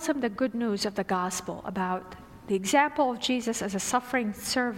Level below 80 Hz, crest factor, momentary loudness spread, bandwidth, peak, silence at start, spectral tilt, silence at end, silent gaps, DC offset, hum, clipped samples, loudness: -60 dBFS; 20 dB; 9 LU; 16 kHz; -8 dBFS; 0 s; -3.5 dB/octave; 0 s; none; under 0.1%; none; under 0.1%; -28 LUFS